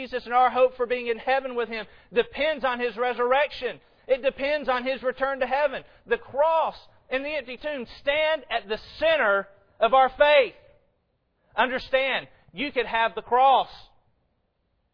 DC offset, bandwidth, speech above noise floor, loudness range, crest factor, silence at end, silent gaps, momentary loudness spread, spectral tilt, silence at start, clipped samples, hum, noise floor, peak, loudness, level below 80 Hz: under 0.1%; 5.4 kHz; 48 dB; 4 LU; 20 dB; 1.15 s; none; 12 LU; -5 dB/octave; 0 s; under 0.1%; none; -72 dBFS; -6 dBFS; -24 LUFS; -54 dBFS